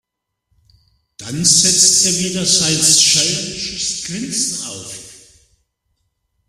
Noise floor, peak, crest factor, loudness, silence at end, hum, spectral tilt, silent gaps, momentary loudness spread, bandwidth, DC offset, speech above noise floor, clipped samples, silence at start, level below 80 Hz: -69 dBFS; 0 dBFS; 18 dB; -12 LUFS; 1.3 s; none; -1 dB/octave; none; 18 LU; 16 kHz; under 0.1%; 54 dB; under 0.1%; 1.2 s; -52 dBFS